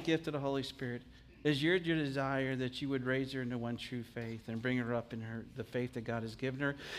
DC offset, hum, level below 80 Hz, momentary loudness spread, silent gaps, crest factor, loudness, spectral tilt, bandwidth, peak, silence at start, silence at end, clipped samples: under 0.1%; none; -64 dBFS; 11 LU; none; 18 dB; -37 LUFS; -6.5 dB/octave; 15 kHz; -18 dBFS; 0 s; 0 s; under 0.1%